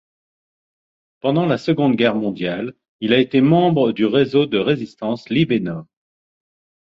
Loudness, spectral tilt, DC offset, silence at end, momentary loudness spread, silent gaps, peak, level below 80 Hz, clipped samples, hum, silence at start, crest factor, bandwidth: -18 LUFS; -8 dB/octave; under 0.1%; 1.1 s; 11 LU; 2.89-2.99 s; -2 dBFS; -58 dBFS; under 0.1%; none; 1.25 s; 16 dB; 7.4 kHz